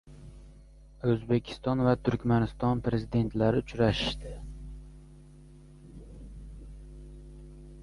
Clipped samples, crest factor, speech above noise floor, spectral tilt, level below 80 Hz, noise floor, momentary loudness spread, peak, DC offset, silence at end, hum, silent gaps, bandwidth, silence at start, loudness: under 0.1%; 20 dB; 25 dB; -7.5 dB/octave; -46 dBFS; -52 dBFS; 23 LU; -12 dBFS; under 0.1%; 0 s; none; none; 11.5 kHz; 0.05 s; -29 LUFS